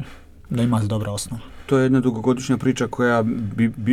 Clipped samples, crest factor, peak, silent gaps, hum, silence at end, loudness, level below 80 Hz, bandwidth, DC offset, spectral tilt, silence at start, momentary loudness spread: under 0.1%; 14 dB; -6 dBFS; none; none; 0 s; -21 LUFS; -46 dBFS; 14 kHz; under 0.1%; -6.5 dB/octave; 0 s; 10 LU